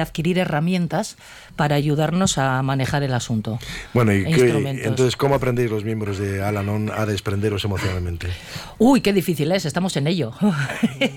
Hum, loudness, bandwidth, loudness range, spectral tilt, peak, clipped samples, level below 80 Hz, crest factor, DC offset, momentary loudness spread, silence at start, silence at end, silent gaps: none; -21 LUFS; 18.5 kHz; 2 LU; -6 dB/octave; -6 dBFS; under 0.1%; -44 dBFS; 14 dB; under 0.1%; 9 LU; 0 s; 0 s; none